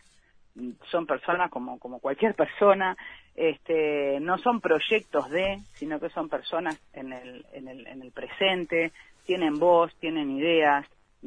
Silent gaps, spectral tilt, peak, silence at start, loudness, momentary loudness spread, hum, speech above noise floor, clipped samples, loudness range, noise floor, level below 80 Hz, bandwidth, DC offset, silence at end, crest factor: none; -6 dB/octave; -6 dBFS; 0.55 s; -26 LUFS; 19 LU; none; 33 dB; under 0.1%; 6 LU; -59 dBFS; -60 dBFS; 9.8 kHz; under 0.1%; 0 s; 20 dB